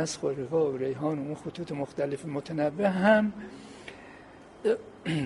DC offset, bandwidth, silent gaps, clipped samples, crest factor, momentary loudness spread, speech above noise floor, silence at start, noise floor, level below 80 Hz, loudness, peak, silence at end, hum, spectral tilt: under 0.1%; 11.5 kHz; none; under 0.1%; 20 dB; 21 LU; 21 dB; 0 s; -50 dBFS; -64 dBFS; -29 LUFS; -8 dBFS; 0 s; none; -6 dB/octave